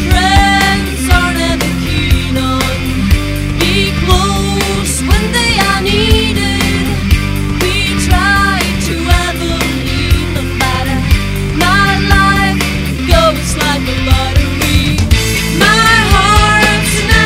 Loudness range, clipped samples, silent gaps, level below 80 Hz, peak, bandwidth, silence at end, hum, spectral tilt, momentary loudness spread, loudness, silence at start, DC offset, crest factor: 3 LU; 0.3%; none; -16 dBFS; 0 dBFS; 16.5 kHz; 0 s; none; -4.5 dB/octave; 6 LU; -11 LUFS; 0 s; under 0.1%; 10 dB